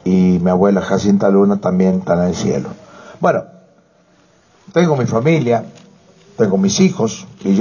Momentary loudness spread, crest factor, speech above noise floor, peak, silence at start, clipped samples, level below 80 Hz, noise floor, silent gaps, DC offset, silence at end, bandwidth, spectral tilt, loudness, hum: 8 LU; 14 dB; 38 dB; 0 dBFS; 0.05 s; under 0.1%; -44 dBFS; -52 dBFS; none; under 0.1%; 0 s; 7.2 kHz; -6.5 dB/octave; -15 LUFS; none